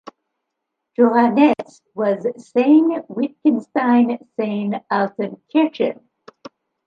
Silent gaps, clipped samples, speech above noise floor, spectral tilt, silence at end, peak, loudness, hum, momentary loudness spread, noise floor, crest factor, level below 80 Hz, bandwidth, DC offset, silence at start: none; under 0.1%; 61 dB; -7.5 dB/octave; 0.95 s; -2 dBFS; -18 LUFS; none; 11 LU; -79 dBFS; 16 dB; -72 dBFS; 7.4 kHz; under 0.1%; 1 s